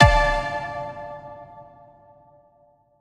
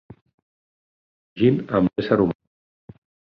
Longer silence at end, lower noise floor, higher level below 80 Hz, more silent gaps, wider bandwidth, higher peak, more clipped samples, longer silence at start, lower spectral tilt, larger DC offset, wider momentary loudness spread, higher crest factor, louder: first, 1.4 s vs 0.95 s; second, -59 dBFS vs under -90 dBFS; first, -32 dBFS vs -54 dBFS; neither; first, 11.5 kHz vs 5.8 kHz; first, 0 dBFS vs -4 dBFS; neither; second, 0 s vs 1.35 s; second, -5.5 dB/octave vs -10 dB/octave; neither; first, 24 LU vs 4 LU; about the same, 24 dB vs 22 dB; about the same, -23 LUFS vs -21 LUFS